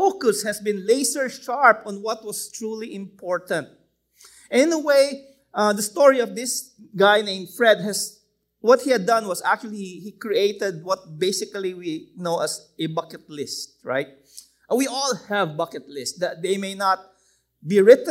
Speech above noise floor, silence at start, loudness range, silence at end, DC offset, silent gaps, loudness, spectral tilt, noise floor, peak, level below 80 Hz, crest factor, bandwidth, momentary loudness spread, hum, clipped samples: 43 dB; 0 s; 7 LU; 0 s; under 0.1%; none; -22 LUFS; -3.5 dB/octave; -64 dBFS; 0 dBFS; -72 dBFS; 22 dB; 16 kHz; 14 LU; none; under 0.1%